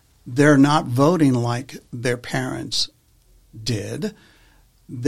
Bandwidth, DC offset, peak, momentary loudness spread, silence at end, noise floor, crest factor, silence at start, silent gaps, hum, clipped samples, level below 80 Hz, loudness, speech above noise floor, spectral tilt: 14.5 kHz; 0.4%; -2 dBFS; 15 LU; 0 s; -55 dBFS; 18 dB; 0.25 s; none; none; under 0.1%; -54 dBFS; -20 LUFS; 36 dB; -5.5 dB/octave